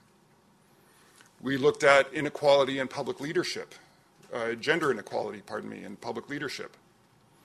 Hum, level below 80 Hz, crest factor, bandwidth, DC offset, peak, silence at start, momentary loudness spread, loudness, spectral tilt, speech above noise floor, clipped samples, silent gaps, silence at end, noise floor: none; -70 dBFS; 26 dB; 13.5 kHz; under 0.1%; -4 dBFS; 1.45 s; 17 LU; -28 LUFS; -4 dB/octave; 34 dB; under 0.1%; none; 0.75 s; -62 dBFS